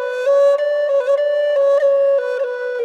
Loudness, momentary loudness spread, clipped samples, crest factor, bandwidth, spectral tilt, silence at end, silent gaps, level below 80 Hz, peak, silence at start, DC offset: -16 LUFS; 6 LU; under 0.1%; 8 dB; 7.8 kHz; -0.5 dB/octave; 0 s; none; -76 dBFS; -6 dBFS; 0 s; under 0.1%